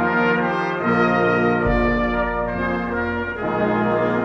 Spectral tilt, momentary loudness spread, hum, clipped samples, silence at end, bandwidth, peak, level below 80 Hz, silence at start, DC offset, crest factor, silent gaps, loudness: -8 dB/octave; 6 LU; none; under 0.1%; 0 s; 6.8 kHz; -6 dBFS; -34 dBFS; 0 s; under 0.1%; 14 dB; none; -20 LUFS